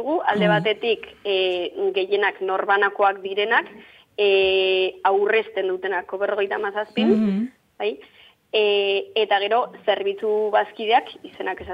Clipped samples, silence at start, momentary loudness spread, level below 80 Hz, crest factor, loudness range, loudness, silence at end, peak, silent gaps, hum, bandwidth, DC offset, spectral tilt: under 0.1%; 0 s; 10 LU; -62 dBFS; 16 dB; 3 LU; -21 LUFS; 0 s; -6 dBFS; none; none; 5.4 kHz; under 0.1%; -7 dB/octave